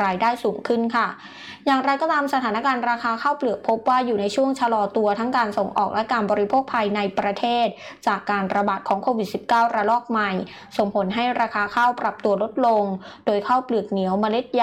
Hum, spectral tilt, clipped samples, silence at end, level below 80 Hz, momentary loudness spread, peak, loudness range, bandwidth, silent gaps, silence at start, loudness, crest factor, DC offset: none; -5.5 dB/octave; under 0.1%; 0 s; -64 dBFS; 5 LU; -10 dBFS; 1 LU; 14.5 kHz; none; 0 s; -22 LUFS; 12 dB; under 0.1%